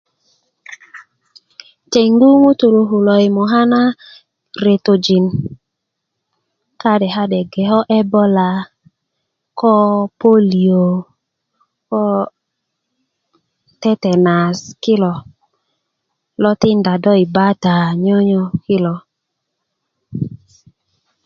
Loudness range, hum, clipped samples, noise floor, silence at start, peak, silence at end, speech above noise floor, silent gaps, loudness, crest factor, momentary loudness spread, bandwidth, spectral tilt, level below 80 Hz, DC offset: 6 LU; none; under 0.1%; -76 dBFS; 0.7 s; 0 dBFS; 0.9 s; 64 dB; none; -14 LUFS; 16 dB; 14 LU; 7 kHz; -7 dB/octave; -54 dBFS; under 0.1%